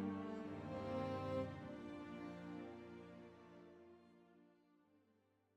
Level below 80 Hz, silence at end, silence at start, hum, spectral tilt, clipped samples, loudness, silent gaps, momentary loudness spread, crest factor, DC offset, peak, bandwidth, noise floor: -76 dBFS; 0.6 s; 0 s; none; -8 dB/octave; under 0.1%; -49 LUFS; none; 20 LU; 18 dB; under 0.1%; -32 dBFS; 11.5 kHz; -79 dBFS